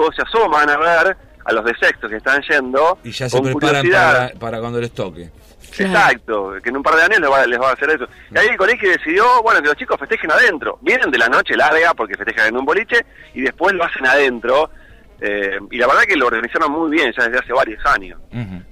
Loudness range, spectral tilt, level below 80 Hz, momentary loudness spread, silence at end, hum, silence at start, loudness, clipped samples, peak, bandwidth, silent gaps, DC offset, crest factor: 3 LU; -4.5 dB/octave; -44 dBFS; 11 LU; 0.1 s; none; 0 s; -15 LUFS; under 0.1%; -6 dBFS; 15.5 kHz; none; under 0.1%; 10 dB